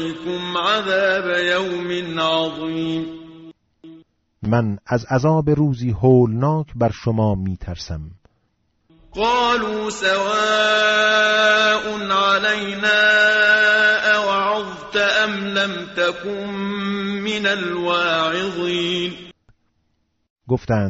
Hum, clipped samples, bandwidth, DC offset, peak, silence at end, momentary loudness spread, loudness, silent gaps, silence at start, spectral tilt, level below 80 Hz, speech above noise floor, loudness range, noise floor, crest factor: none; under 0.1%; 8 kHz; under 0.1%; -4 dBFS; 0 s; 11 LU; -18 LUFS; 20.30-20.36 s; 0 s; -3 dB/octave; -46 dBFS; 49 dB; 8 LU; -68 dBFS; 16 dB